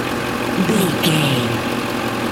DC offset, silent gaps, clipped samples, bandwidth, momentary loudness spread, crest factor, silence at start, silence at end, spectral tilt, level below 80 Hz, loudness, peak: under 0.1%; none; under 0.1%; 17 kHz; 5 LU; 16 dB; 0 s; 0 s; -4.5 dB/octave; -46 dBFS; -18 LUFS; -4 dBFS